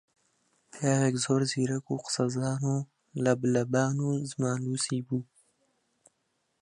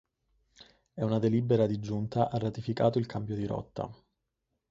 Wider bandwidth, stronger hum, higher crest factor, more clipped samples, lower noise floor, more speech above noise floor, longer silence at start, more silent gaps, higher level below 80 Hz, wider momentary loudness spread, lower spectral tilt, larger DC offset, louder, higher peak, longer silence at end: first, 11 kHz vs 7.6 kHz; neither; about the same, 20 dB vs 20 dB; neither; second, -77 dBFS vs -83 dBFS; second, 49 dB vs 53 dB; first, 0.75 s vs 0.6 s; neither; second, -70 dBFS vs -60 dBFS; second, 6 LU vs 12 LU; second, -5.5 dB/octave vs -8.5 dB/octave; neither; about the same, -29 LUFS vs -31 LUFS; about the same, -10 dBFS vs -12 dBFS; first, 1.4 s vs 0.75 s